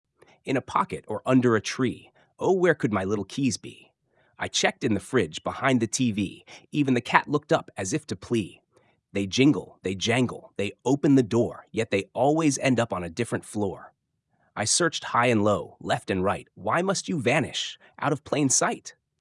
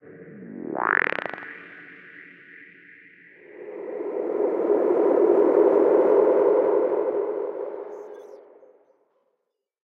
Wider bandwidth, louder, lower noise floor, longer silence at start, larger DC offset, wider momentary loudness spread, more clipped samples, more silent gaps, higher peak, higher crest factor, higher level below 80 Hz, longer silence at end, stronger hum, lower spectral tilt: first, 12 kHz vs 4.3 kHz; second, -25 LUFS vs -22 LUFS; second, -73 dBFS vs -79 dBFS; first, 0.45 s vs 0.05 s; neither; second, 10 LU vs 24 LU; neither; neither; first, 0 dBFS vs -4 dBFS; first, 26 dB vs 20 dB; first, -66 dBFS vs -78 dBFS; second, 0.3 s vs 1.55 s; neither; second, -4.5 dB/octave vs -7.5 dB/octave